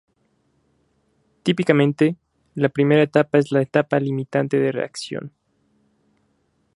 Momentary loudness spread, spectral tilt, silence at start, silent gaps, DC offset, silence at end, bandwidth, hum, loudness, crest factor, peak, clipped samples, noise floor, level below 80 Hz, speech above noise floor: 14 LU; -7 dB/octave; 1.45 s; none; under 0.1%; 1.45 s; 11.5 kHz; none; -20 LUFS; 22 dB; 0 dBFS; under 0.1%; -66 dBFS; -66 dBFS; 47 dB